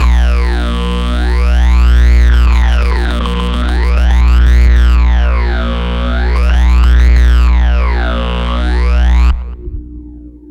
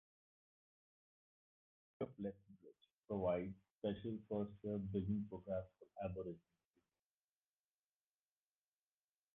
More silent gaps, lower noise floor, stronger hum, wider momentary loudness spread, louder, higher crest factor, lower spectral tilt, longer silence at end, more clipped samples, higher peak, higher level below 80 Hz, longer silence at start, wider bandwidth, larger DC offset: second, none vs 2.93-3.03 s, 3.70-3.79 s; second, -31 dBFS vs under -90 dBFS; first, 60 Hz at -10 dBFS vs none; second, 7 LU vs 15 LU; first, -12 LUFS vs -46 LUFS; second, 8 dB vs 20 dB; about the same, -6.5 dB/octave vs -7.5 dB/octave; second, 0.15 s vs 3 s; neither; first, -2 dBFS vs -28 dBFS; first, -10 dBFS vs -70 dBFS; second, 0 s vs 2 s; first, 6.8 kHz vs 3.8 kHz; neither